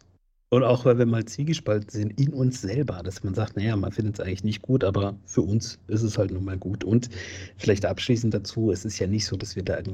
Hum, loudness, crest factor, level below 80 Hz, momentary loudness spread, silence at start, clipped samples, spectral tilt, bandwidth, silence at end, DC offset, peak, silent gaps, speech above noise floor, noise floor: none; -26 LUFS; 20 dB; -52 dBFS; 9 LU; 0.5 s; under 0.1%; -6.5 dB/octave; 9.2 kHz; 0 s; under 0.1%; -6 dBFS; none; 37 dB; -62 dBFS